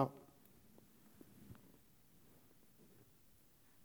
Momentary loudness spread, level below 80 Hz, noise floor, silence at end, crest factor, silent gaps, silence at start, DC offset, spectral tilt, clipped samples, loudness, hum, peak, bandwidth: 7 LU; -80 dBFS; -70 dBFS; 2.3 s; 32 dB; none; 0 s; under 0.1%; -7.5 dB/octave; under 0.1%; -54 LUFS; none; -20 dBFS; over 20 kHz